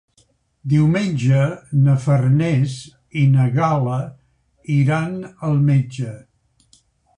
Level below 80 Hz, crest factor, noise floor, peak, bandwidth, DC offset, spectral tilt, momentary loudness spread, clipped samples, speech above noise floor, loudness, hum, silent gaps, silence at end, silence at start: -50 dBFS; 12 dB; -60 dBFS; -6 dBFS; 10 kHz; under 0.1%; -8 dB/octave; 13 LU; under 0.1%; 43 dB; -18 LUFS; none; none; 1 s; 0.65 s